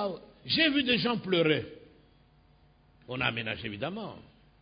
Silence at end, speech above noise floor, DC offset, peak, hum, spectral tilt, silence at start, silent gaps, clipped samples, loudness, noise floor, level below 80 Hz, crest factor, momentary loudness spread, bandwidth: 0.4 s; 32 dB; under 0.1%; -10 dBFS; none; -9 dB/octave; 0 s; none; under 0.1%; -28 LUFS; -62 dBFS; -60 dBFS; 22 dB; 17 LU; 5.2 kHz